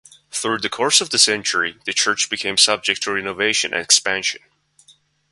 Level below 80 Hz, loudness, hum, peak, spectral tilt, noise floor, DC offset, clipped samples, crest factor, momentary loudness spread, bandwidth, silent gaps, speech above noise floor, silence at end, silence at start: -62 dBFS; -17 LUFS; none; 0 dBFS; 0 dB/octave; -55 dBFS; under 0.1%; under 0.1%; 20 dB; 8 LU; 11.5 kHz; none; 35 dB; 0.95 s; 0.35 s